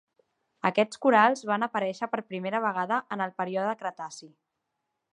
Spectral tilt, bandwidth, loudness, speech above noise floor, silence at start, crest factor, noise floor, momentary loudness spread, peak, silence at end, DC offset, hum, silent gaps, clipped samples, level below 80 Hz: -5 dB/octave; 11 kHz; -27 LUFS; 55 dB; 0.65 s; 22 dB; -82 dBFS; 13 LU; -6 dBFS; 0.85 s; under 0.1%; none; none; under 0.1%; -82 dBFS